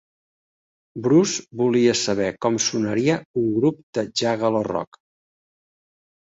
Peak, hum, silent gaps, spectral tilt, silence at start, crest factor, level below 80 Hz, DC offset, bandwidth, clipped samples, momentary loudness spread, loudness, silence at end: -6 dBFS; none; 3.25-3.34 s, 3.83-3.93 s; -4.5 dB/octave; 0.95 s; 18 dB; -60 dBFS; under 0.1%; 8 kHz; under 0.1%; 10 LU; -21 LUFS; 1.35 s